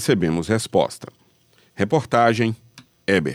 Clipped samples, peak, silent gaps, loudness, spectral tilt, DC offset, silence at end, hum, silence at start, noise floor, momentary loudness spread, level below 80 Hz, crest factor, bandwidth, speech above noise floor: under 0.1%; -4 dBFS; none; -21 LUFS; -5.5 dB/octave; under 0.1%; 0 s; none; 0 s; -58 dBFS; 12 LU; -52 dBFS; 18 dB; 20 kHz; 38 dB